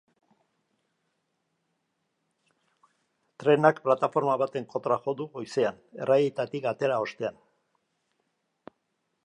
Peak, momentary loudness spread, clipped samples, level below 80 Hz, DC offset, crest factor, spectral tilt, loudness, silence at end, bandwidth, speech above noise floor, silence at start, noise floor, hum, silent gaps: -6 dBFS; 11 LU; under 0.1%; -80 dBFS; under 0.1%; 24 dB; -6.5 dB/octave; -27 LUFS; 1.95 s; 10 kHz; 52 dB; 3.4 s; -78 dBFS; none; none